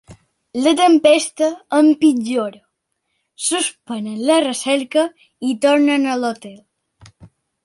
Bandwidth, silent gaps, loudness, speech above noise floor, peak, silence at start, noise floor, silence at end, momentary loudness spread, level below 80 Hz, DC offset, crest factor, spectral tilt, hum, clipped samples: 11.5 kHz; none; -17 LUFS; 56 dB; -2 dBFS; 0.1 s; -72 dBFS; 0.4 s; 13 LU; -64 dBFS; under 0.1%; 16 dB; -3 dB/octave; none; under 0.1%